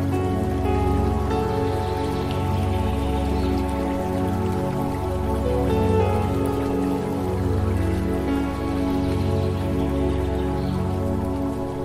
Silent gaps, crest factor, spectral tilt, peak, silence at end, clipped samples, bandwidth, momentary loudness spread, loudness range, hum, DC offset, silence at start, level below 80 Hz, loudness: none; 14 dB; -8 dB/octave; -8 dBFS; 0 s; under 0.1%; 15.5 kHz; 3 LU; 1 LU; none; under 0.1%; 0 s; -30 dBFS; -24 LUFS